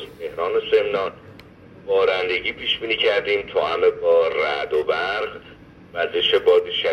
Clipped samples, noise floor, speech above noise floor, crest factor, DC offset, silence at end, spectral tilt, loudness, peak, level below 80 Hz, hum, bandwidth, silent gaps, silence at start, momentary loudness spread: under 0.1%; -44 dBFS; 24 dB; 16 dB; under 0.1%; 0 s; -4.5 dB/octave; -20 LUFS; -6 dBFS; -56 dBFS; none; 6.6 kHz; none; 0 s; 10 LU